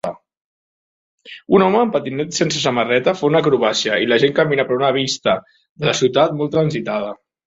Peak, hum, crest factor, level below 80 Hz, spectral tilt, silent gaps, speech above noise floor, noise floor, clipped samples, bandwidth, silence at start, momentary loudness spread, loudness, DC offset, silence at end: -2 dBFS; none; 16 dB; -58 dBFS; -4.5 dB/octave; 0.44-1.18 s, 5.69-5.76 s; over 73 dB; under -90 dBFS; under 0.1%; 8 kHz; 0.05 s; 8 LU; -17 LUFS; under 0.1%; 0.3 s